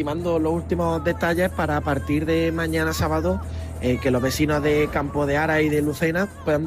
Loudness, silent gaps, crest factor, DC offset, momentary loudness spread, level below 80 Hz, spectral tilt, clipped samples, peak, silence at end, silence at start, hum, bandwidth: -22 LUFS; none; 14 dB; under 0.1%; 4 LU; -36 dBFS; -6 dB/octave; under 0.1%; -8 dBFS; 0 s; 0 s; none; 15.5 kHz